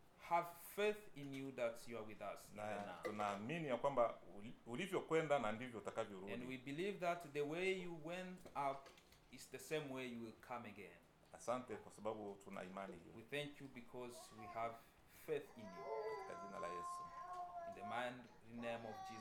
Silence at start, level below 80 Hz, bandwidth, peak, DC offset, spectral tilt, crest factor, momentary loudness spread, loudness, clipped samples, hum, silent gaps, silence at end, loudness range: 0 s; -74 dBFS; 19 kHz; -26 dBFS; under 0.1%; -5 dB/octave; 22 dB; 15 LU; -47 LUFS; under 0.1%; none; none; 0 s; 7 LU